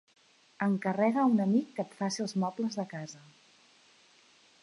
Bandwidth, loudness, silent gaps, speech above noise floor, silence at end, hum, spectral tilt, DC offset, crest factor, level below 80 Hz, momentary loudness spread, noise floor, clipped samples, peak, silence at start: 11.5 kHz; -31 LUFS; none; 32 dB; 1.45 s; none; -6 dB/octave; under 0.1%; 18 dB; -84 dBFS; 14 LU; -62 dBFS; under 0.1%; -14 dBFS; 0.6 s